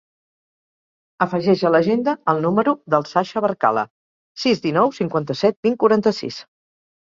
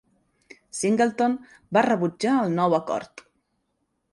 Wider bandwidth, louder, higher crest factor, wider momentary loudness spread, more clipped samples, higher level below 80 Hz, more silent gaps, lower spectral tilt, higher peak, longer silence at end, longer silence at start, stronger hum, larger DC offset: second, 7.6 kHz vs 11.5 kHz; first, -19 LUFS vs -24 LUFS; about the same, 20 dB vs 18 dB; second, 7 LU vs 11 LU; neither; first, -62 dBFS vs -68 dBFS; first, 3.90-4.35 s, 5.56-5.63 s vs none; about the same, -6.5 dB/octave vs -5.5 dB/octave; first, 0 dBFS vs -6 dBFS; second, 0.6 s vs 1.05 s; first, 1.2 s vs 0.75 s; neither; neither